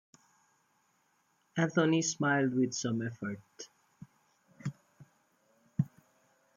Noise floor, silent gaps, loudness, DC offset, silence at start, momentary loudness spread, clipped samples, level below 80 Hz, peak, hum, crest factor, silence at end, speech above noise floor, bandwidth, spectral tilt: -74 dBFS; none; -33 LUFS; under 0.1%; 1.55 s; 16 LU; under 0.1%; -76 dBFS; -14 dBFS; none; 22 dB; 0.7 s; 43 dB; 9.6 kHz; -5 dB/octave